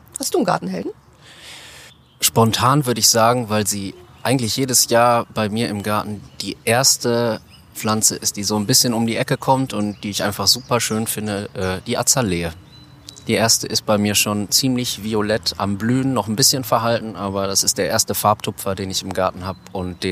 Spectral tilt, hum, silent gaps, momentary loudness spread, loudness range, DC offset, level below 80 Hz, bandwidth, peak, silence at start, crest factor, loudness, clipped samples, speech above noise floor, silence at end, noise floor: -3 dB/octave; none; none; 12 LU; 3 LU; under 0.1%; -50 dBFS; 15.5 kHz; 0 dBFS; 0.15 s; 20 dB; -18 LUFS; under 0.1%; 25 dB; 0 s; -44 dBFS